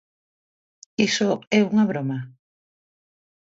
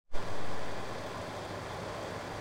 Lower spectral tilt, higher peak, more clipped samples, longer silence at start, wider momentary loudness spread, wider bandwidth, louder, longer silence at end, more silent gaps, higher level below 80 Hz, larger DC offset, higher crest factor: about the same, -5 dB/octave vs -4.5 dB/octave; first, -6 dBFS vs -18 dBFS; neither; first, 1 s vs 0.05 s; first, 14 LU vs 1 LU; second, 7.8 kHz vs 16 kHz; first, -22 LUFS vs -40 LUFS; first, 1.2 s vs 0 s; first, 1.47-1.51 s vs none; second, -68 dBFS vs -50 dBFS; neither; about the same, 20 dB vs 16 dB